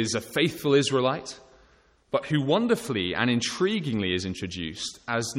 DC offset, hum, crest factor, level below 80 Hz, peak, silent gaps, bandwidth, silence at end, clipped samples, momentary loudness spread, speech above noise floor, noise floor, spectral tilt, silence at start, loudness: under 0.1%; none; 18 dB; -58 dBFS; -8 dBFS; none; 16.5 kHz; 0 s; under 0.1%; 10 LU; 34 dB; -60 dBFS; -4.5 dB/octave; 0 s; -26 LUFS